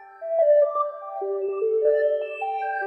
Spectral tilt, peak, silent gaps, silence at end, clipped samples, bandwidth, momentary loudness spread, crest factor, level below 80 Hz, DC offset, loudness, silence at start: -4.5 dB/octave; -10 dBFS; none; 0 s; under 0.1%; 4.2 kHz; 10 LU; 12 dB; under -90 dBFS; under 0.1%; -23 LUFS; 0 s